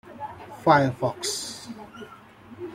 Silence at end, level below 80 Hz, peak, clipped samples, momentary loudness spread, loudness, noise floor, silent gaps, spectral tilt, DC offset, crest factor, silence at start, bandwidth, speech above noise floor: 0 s; -64 dBFS; -4 dBFS; under 0.1%; 22 LU; -24 LUFS; -47 dBFS; none; -4.5 dB/octave; under 0.1%; 24 dB; 0.05 s; 16.5 kHz; 24 dB